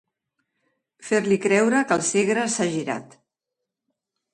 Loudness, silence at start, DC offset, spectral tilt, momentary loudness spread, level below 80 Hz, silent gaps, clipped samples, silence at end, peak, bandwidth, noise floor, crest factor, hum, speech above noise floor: -22 LUFS; 1 s; under 0.1%; -4 dB/octave; 11 LU; -70 dBFS; none; under 0.1%; 1.3 s; -6 dBFS; 11.5 kHz; -84 dBFS; 20 dB; none; 63 dB